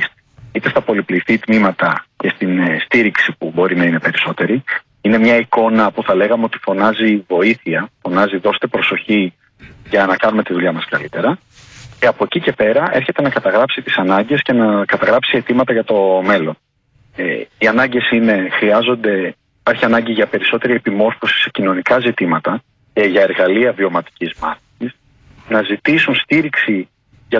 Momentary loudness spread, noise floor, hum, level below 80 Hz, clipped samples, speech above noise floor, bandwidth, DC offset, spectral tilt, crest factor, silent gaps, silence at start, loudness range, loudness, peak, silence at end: 8 LU; -54 dBFS; none; -54 dBFS; under 0.1%; 39 dB; 7.4 kHz; under 0.1%; -7 dB/octave; 14 dB; none; 0 s; 3 LU; -15 LUFS; -2 dBFS; 0 s